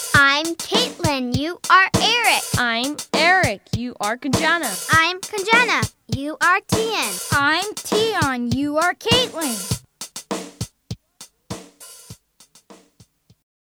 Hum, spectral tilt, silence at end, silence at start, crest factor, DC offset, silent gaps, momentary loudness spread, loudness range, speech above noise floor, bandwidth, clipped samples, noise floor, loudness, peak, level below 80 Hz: none; -3 dB/octave; 0.95 s; 0 s; 20 dB; under 0.1%; none; 17 LU; 14 LU; 35 dB; over 20 kHz; under 0.1%; -55 dBFS; -18 LUFS; 0 dBFS; -46 dBFS